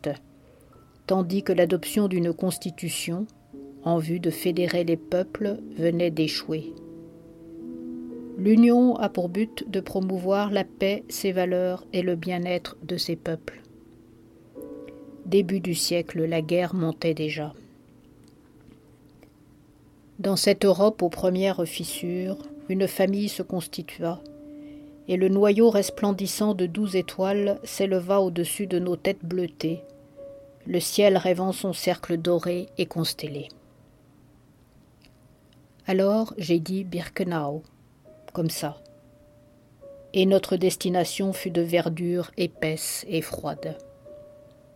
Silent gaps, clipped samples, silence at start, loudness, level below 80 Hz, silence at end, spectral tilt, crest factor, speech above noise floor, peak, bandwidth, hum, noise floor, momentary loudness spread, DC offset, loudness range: none; under 0.1%; 0.05 s; -25 LUFS; -60 dBFS; 0.45 s; -5.5 dB/octave; 20 dB; 32 dB; -6 dBFS; 16.5 kHz; none; -56 dBFS; 17 LU; under 0.1%; 7 LU